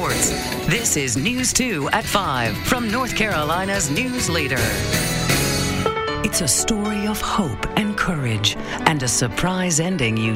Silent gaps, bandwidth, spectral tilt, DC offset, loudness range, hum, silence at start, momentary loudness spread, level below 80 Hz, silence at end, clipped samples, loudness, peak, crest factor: none; 16.5 kHz; -3.5 dB/octave; under 0.1%; 1 LU; none; 0 s; 4 LU; -36 dBFS; 0 s; under 0.1%; -20 LUFS; 0 dBFS; 20 dB